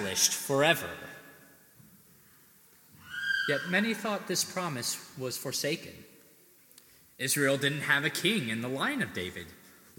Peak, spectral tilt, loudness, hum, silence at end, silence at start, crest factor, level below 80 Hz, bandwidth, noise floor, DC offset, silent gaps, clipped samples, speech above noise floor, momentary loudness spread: -10 dBFS; -2.5 dB/octave; -29 LUFS; none; 0.25 s; 0 s; 24 dB; -74 dBFS; 17.5 kHz; -60 dBFS; under 0.1%; none; under 0.1%; 29 dB; 15 LU